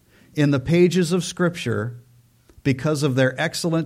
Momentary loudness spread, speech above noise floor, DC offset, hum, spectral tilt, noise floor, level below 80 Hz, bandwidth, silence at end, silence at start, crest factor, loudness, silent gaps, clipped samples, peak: 10 LU; 34 dB; under 0.1%; none; -6 dB/octave; -54 dBFS; -54 dBFS; 15.5 kHz; 0 s; 0.35 s; 16 dB; -21 LUFS; none; under 0.1%; -6 dBFS